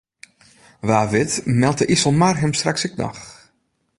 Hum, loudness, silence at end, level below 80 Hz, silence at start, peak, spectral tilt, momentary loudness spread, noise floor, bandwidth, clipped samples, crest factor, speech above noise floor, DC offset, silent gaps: none; -19 LUFS; 0.65 s; -50 dBFS; 0.85 s; -2 dBFS; -4.5 dB/octave; 12 LU; -67 dBFS; 11.5 kHz; under 0.1%; 18 dB; 49 dB; under 0.1%; none